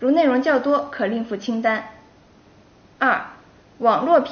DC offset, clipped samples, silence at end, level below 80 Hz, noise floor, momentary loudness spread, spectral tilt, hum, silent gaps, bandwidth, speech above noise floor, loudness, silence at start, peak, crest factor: under 0.1%; under 0.1%; 0 s; -62 dBFS; -51 dBFS; 9 LU; -3 dB/octave; none; none; 6.6 kHz; 32 dB; -20 LUFS; 0 s; -4 dBFS; 18 dB